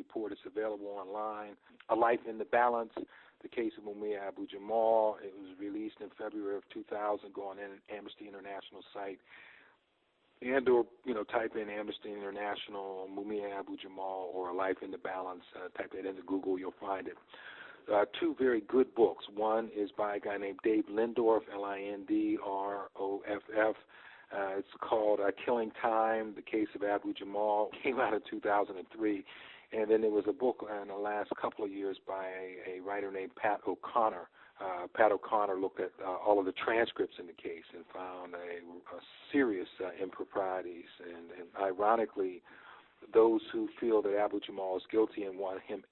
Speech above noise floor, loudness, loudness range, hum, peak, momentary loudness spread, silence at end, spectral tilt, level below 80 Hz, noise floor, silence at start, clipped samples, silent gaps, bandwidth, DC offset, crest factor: 40 dB; -35 LUFS; 7 LU; none; -12 dBFS; 16 LU; 0.1 s; -8 dB/octave; -76 dBFS; -75 dBFS; 0 s; under 0.1%; none; 4.2 kHz; under 0.1%; 22 dB